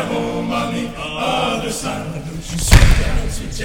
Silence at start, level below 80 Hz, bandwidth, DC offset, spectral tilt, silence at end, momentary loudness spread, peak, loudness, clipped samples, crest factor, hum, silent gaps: 0 s; -20 dBFS; 19 kHz; 0.4%; -4.5 dB/octave; 0 s; 13 LU; 0 dBFS; -19 LUFS; 0.3%; 16 dB; none; none